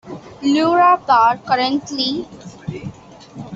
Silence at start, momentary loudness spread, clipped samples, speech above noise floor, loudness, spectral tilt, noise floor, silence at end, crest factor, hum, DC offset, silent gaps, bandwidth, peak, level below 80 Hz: 0.05 s; 22 LU; under 0.1%; 23 dB; -16 LUFS; -5 dB/octave; -39 dBFS; 0 s; 16 dB; none; under 0.1%; none; 7.8 kHz; -2 dBFS; -56 dBFS